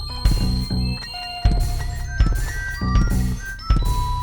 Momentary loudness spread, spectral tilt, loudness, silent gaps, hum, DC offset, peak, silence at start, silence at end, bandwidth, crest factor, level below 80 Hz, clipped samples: 7 LU; -5.5 dB/octave; -23 LUFS; none; none; under 0.1%; -4 dBFS; 0 s; 0 s; over 20 kHz; 16 dB; -22 dBFS; under 0.1%